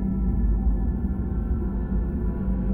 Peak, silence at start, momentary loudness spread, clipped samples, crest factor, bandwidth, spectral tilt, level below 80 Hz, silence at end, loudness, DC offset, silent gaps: -12 dBFS; 0 s; 3 LU; under 0.1%; 10 dB; 2.2 kHz; -12.5 dB/octave; -26 dBFS; 0 s; -27 LUFS; under 0.1%; none